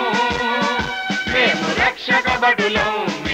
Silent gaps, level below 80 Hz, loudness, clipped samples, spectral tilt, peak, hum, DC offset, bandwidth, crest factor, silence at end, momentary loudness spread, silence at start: none; -42 dBFS; -17 LUFS; under 0.1%; -3.5 dB/octave; -6 dBFS; none; under 0.1%; 16 kHz; 14 dB; 0 s; 6 LU; 0 s